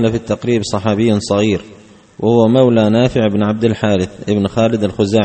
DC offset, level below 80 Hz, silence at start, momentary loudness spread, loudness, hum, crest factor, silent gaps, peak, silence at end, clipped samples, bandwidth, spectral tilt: under 0.1%; -44 dBFS; 0 s; 7 LU; -14 LUFS; none; 14 dB; none; 0 dBFS; 0 s; under 0.1%; 8.8 kHz; -6.5 dB/octave